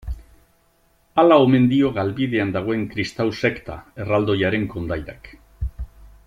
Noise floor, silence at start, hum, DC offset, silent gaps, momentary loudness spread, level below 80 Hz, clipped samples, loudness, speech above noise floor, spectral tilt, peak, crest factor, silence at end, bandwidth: -60 dBFS; 0.05 s; none; under 0.1%; none; 21 LU; -38 dBFS; under 0.1%; -20 LUFS; 41 dB; -7.5 dB/octave; -2 dBFS; 18 dB; 0.2 s; 11 kHz